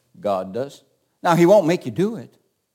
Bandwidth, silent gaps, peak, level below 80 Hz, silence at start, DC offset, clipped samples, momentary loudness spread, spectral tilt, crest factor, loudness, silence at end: 17 kHz; none; -4 dBFS; -72 dBFS; 0.25 s; under 0.1%; under 0.1%; 16 LU; -6.5 dB/octave; 18 dB; -19 LUFS; 0.5 s